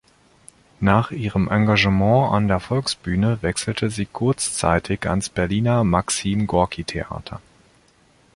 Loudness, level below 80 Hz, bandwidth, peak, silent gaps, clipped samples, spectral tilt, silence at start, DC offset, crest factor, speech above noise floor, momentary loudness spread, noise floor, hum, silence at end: -20 LUFS; -40 dBFS; 11.5 kHz; -2 dBFS; none; under 0.1%; -5.5 dB/octave; 0.8 s; under 0.1%; 20 dB; 36 dB; 9 LU; -56 dBFS; none; 0.95 s